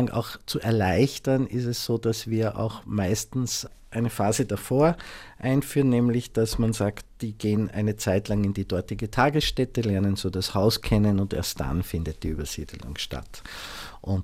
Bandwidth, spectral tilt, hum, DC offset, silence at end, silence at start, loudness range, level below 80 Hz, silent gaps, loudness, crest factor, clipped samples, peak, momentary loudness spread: 16 kHz; -5.5 dB/octave; none; under 0.1%; 0 s; 0 s; 2 LU; -42 dBFS; none; -26 LUFS; 18 dB; under 0.1%; -6 dBFS; 12 LU